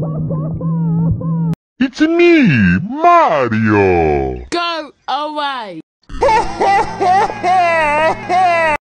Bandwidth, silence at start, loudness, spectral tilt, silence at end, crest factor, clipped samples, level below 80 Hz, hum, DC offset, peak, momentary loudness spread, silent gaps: 10 kHz; 0 s; -14 LUFS; -6.5 dB/octave; 0.05 s; 12 dB; under 0.1%; -36 dBFS; none; under 0.1%; 0 dBFS; 10 LU; 1.56-1.76 s, 5.83-6.00 s